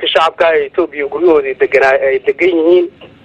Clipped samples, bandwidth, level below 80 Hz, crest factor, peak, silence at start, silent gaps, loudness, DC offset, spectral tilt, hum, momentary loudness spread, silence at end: under 0.1%; 8.2 kHz; -50 dBFS; 12 dB; 0 dBFS; 0 s; none; -12 LUFS; under 0.1%; -4.5 dB/octave; none; 7 LU; 0.2 s